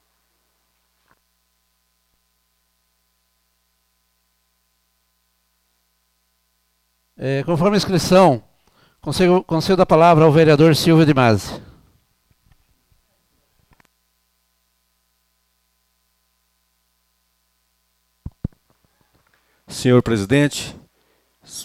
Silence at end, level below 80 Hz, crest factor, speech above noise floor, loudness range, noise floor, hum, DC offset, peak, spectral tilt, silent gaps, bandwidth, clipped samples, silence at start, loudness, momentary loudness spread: 0 s; -48 dBFS; 18 dB; 53 dB; 11 LU; -67 dBFS; 60 Hz at -50 dBFS; under 0.1%; -4 dBFS; -6 dB/octave; none; 15.5 kHz; under 0.1%; 7.2 s; -15 LUFS; 21 LU